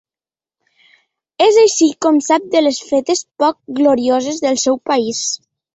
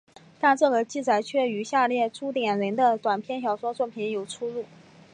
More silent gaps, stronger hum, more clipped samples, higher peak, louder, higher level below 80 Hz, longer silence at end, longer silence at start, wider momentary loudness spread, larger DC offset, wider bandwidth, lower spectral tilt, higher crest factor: neither; neither; neither; first, -2 dBFS vs -8 dBFS; first, -15 LUFS vs -25 LUFS; first, -62 dBFS vs -78 dBFS; about the same, 0.4 s vs 0.5 s; first, 1.4 s vs 0.4 s; about the same, 8 LU vs 10 LU; neither; second, 8.2 kHz vs 10.5 kHz; second, -2.5 dB/octave vs -4.5 dB/octave; about the same, 14 dB vs 18 dB